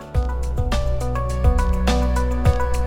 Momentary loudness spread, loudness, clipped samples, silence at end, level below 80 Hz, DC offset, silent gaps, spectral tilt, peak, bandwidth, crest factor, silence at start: 5 LU; -22 LUFS; under 0.1%; 0 s; -20 dBFS; under 0.1%; none; -6.5 dB/octave; -4 dBFS; 12 kHz; 16 dB; 0 s